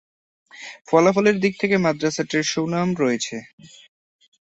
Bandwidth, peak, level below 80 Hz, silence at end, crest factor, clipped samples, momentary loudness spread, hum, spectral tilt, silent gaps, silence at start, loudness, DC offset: 8.2 kHz; -2 dBFS; -62 dBFS; 0.85 s; 20 dB; under 0.1%; 19 LU; none; -5 dB/octave; 0.81-0.85 s, 3.53-3.58 s; 0.55 s; -20 LUFS; under 0.1%